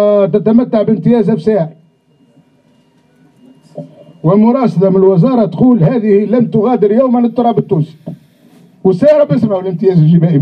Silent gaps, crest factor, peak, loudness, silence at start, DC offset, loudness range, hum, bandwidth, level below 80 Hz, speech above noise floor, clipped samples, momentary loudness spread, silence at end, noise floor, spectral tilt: none; 10 dB; 0 dBFS; -10 LUFS; 0 s; under 0.1%; 7 LU; none; 5.6 kHz; -50 dBFS; 41 dB; under 0.1%; 8 LU; 0 s; -50 dBFS; -10.5 dB/octave